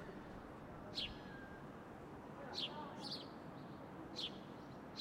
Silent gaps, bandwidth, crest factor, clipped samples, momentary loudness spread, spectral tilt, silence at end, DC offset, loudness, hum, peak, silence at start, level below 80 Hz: none; 16 kHz; 20 dB; under 0.1%; 9 LU; -4.5 dB/octave; 0 s; under 0.1%; -49 LUFS; none; -32 dBFS; 0 s; -68 dBFS